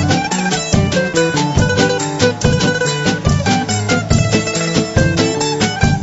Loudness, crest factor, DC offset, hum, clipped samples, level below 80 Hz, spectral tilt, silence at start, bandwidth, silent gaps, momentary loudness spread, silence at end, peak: -15 LUFS; 14 dB; under 0.1%; none; under 0.1%; -28 dBFS; -4.5 dB/octave; 0 s; 8.2 kHz; none; 2 LU; 0 s; 0 dBFS